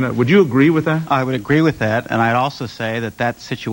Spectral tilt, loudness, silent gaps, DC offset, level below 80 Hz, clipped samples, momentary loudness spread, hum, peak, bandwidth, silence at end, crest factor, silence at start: -7 dB/octave; -17 LUFS; none; under 0.1%; -50 dBFS; under 0.1%; 9 LU; none; -2 dBFS; 16.5 kHz; 0 s; 14 dB; 0 s